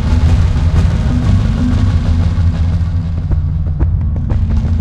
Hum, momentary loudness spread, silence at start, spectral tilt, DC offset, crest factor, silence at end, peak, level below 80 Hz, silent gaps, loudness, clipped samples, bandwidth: none; 4 LU; 0 s; -8 dB/octave; under 0.1%; 10 dB; 0 s; 0 dBFS; -16 dBFS; none; -14 LUFS; under 0.1%; 8 kHz